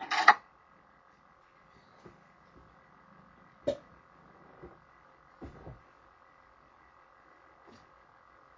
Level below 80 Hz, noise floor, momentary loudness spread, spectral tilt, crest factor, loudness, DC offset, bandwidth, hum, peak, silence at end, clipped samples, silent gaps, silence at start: -66 dBFS; -62 dBFS; 33 LU; -2.5 dB/octave; 34 dB; -28 LUFS; under 0.1%; 7.6 kHz; none; -4 dBFS; 2.85 s; under 0.1%; none; 0 s